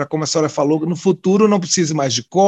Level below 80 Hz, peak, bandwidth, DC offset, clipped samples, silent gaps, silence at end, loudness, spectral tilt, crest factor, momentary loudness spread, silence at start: -62 dBFS; -2 dBFS; 9 kHz; under 0.1%; under 0.1%; none; 0 s; -16 LUFS; -4.5 dB/octave; 14 dB; 4 LU; 0 s